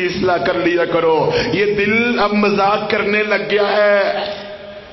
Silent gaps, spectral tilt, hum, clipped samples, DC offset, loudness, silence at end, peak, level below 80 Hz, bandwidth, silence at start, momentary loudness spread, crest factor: none; -6 dB/octave; none; under 0.1%; under 0.1%; -15 LUFS; 0 s; -2 dBFS; -46 dBFS; 6 kHz; 0 s; 7 LU; 14 dB